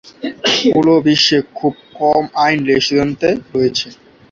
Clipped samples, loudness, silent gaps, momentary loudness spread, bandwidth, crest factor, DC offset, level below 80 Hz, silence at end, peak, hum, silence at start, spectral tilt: under 0.1%; -14 LUFS; none; 9 LU; 7.6 kHz; 14 dB; under 0.1%; -50 dBFS; 0.4 s; 0 dBFS; none; 0.2 s; -4.5 dB/octave